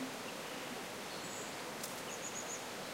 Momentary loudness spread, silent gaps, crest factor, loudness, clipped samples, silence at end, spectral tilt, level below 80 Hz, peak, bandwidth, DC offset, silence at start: 2 LU; none; 20 dB; -43 LUFS; under 0.1%; 0 s; -2 dB/octave; -78 dBFS; -24 dBFS; 16 kHz; under 0.1%; 0 s